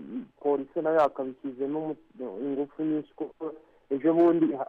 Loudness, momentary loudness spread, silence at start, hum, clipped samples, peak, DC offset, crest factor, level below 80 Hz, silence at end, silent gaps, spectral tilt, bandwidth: -28 LUFS; 17 LU; 0 s; none; under 0.1%; -14 dBFS; under 0.1%; 14 dB; -72 dBFS; 0.05 s; none; -9 dB/octave; 4.6 kHz